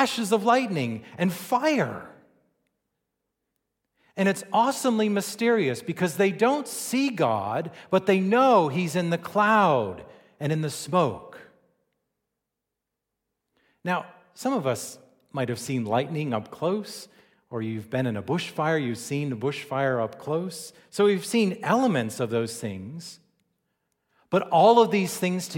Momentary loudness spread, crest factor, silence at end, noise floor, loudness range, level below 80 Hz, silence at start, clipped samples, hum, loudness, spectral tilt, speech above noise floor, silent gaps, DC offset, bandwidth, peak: 14 LU; 20 dB; 0 s; -85 dBFS; 9 LU; -72 dBFS; 0 s; under 0.1%; none; -25 LUFS; -5.5 dB/octave; 60 dB; none; under 0.1%; 17 kHz; -6 dBFS